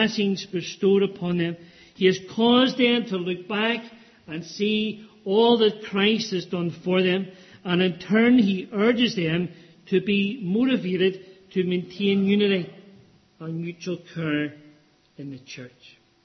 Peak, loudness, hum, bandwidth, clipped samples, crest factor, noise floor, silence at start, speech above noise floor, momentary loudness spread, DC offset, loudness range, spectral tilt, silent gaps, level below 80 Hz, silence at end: -6 dBFS; -23 LUFS; none; 6.4 kHz; under 0.1%; 16 dB; -57 dBFS; 0 s; 34 dB; 17 LU; under 0.1%; 4 LU; -6 dB/octave; none; -66 dBFS; 0.55 s